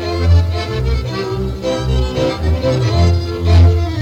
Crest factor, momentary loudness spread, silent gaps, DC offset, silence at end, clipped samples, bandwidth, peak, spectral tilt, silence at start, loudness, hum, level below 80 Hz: 10 dB; 9 LU; none; under 0.1%; 0 s; under 0.1%; 8.4 kHz; -4 dBFS; -7 dB/octave; 0 s; -15 LUFS; none; -20 dBFS